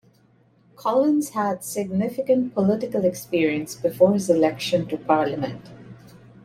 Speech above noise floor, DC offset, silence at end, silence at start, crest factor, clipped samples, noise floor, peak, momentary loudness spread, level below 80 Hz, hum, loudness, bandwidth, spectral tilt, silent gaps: 37 dB; under 0.1%; 0.25 s; 0.8 s; 18 dB; under 0.1%; -58 dBFS; -4 dBFS; 8 LU; -62 dBFS; none; -22 LUFS; 16 kHz; -6 dB/octave; none